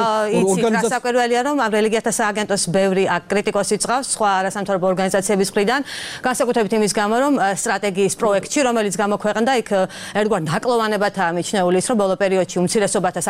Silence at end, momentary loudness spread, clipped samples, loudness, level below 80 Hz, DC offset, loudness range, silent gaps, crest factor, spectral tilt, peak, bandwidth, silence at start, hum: 0 s; 3 LU; under 0.1%; -18 LUFS; -54 dBFS; 0.1%; 1 LU; none; 14 dB; -4 dB/octave; -4 dBFS; 16 kHz; 0 s; none